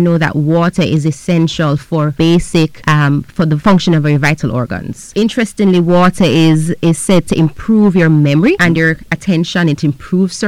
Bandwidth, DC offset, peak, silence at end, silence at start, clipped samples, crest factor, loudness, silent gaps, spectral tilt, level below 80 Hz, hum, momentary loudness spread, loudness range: 13 kHz; under 0.1%; -2 dBFS; 0 s; 0 s; under 0.1%; 8 dB; -12 LUFS; none; -6.5 dB/octave; -36 dBFS; none; 6 LU; 2 LU